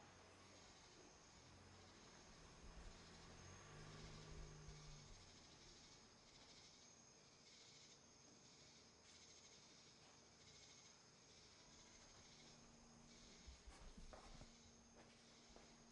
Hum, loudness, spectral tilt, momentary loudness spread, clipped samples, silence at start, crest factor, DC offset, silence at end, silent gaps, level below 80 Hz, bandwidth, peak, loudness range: none; -64 LUFS; -3 dB/octave; 6 LU; under 0.1%; 0 s; 18 dB; under 0.1%; 0 s; none; -70 dBFS; 10.5 kHz; -46 dBFS; 4 LU